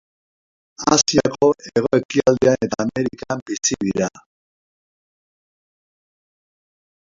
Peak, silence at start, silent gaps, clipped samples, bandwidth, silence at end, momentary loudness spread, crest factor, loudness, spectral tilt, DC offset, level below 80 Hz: 0 dBFS; 0.8 s; 2.05-2.09 s, 3.42-3.46 s; under 0.1%; 7.8 kHz; 3 s; 9 LU; 22 dB; -19 LUFS; -4 dB/octave; under 0.1%; -52 dBFS